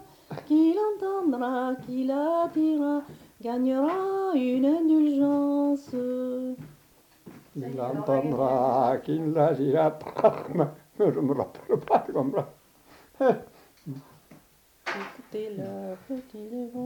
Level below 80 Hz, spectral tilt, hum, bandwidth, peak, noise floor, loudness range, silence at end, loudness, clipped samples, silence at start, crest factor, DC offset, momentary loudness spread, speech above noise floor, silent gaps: -68 dBFS; -8 dB/octave; none; 19 kHz; -6 dBFS; -59 dBFS; 8 LU; 0 s; -26 LUFS; under 0.1%; 0 s; 20 dB; under 0.1%; 15 LU; 33 dB; none